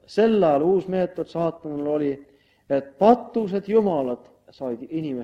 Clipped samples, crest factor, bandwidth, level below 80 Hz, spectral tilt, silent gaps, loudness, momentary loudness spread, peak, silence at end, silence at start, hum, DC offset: under 0.1%; 20 dB; 8 kHz; -62 dBFS; -8.5 dB/octave; none; -23 LUFS; 13 LU; -2 dBFS; 0 s; 0.1 s; none; under 0.1%